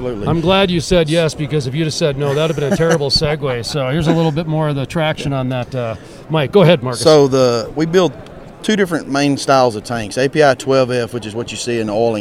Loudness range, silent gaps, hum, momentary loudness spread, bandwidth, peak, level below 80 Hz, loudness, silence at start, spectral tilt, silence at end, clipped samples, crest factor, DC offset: 2 LU; none; none; 10 LU; 15 kHz; 0 dBFS; -38 dBFS; -15 LUFS; 0 s; -5.5 dB/octave; 0 s; under 0.1%; 16 dB; under 0.1%